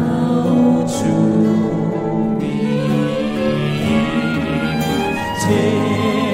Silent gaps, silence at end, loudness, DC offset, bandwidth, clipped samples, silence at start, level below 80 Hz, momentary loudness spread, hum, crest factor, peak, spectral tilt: none; 0 s; -17 LUFS; under 0.1%; 16 kHz; under 0.1%; 0 s; -42 dBFS; 5 LU; none; 14 dB; -2 dBFS; -6.5 dB/octave